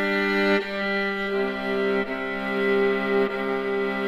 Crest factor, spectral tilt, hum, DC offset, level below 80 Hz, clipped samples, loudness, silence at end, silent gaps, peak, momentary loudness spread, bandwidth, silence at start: 16 dB; -6.5 dB/octave; none; under 0.1%; -54 dBFS; under 0.1%; -24 LUFS; 0 s; none; -8 dBFS; 4 LU; 12.5 kHz; 0 s